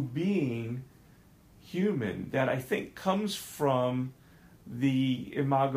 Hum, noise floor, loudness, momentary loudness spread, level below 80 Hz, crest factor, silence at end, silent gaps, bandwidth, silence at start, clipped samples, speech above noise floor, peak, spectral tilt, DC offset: none; -58 dBFS; -31 LUFS; 10 LU; -64 dBFS; 18 dB; 0 s; none; 15.5 kHz; 0 s; under 0.1%; 28 dB; -14 dBFS; -6.5 dB/octave; under 0.1%